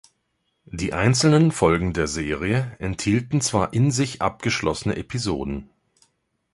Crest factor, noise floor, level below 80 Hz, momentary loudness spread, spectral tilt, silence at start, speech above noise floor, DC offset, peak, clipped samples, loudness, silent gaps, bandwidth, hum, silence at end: 20 dB; -73 dBFS; -42 dBFS; 11 LU; -5 dB/octave; 0.75 s; 51 dB; under 0.1%; -2 dBFS; under 0.1%; -22 LUFS; none; 11.5 kHz; none; 0.9 s